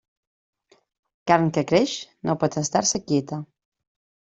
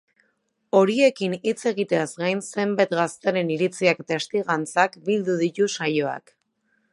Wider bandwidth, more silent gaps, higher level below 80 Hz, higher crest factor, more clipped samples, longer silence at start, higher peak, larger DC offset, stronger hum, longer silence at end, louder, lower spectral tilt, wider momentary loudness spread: second, 8.2 kHz vs 11.5 kHz; neither; first, -62 dBFS vs -76 dBFS; about the same, 22 dB vs 20 dB; neither; first, 1.25 s vs 0.75 s; about the same, -2 dBFS vs -4 dBFS; neither; neither; first, 0.9 s vs 0.75 s; about the same, -22 LUFS vs -23 LUFS; about the same, -4.5 dB/octave vs -5 dB/octave; first, 12 LU vs 6 LU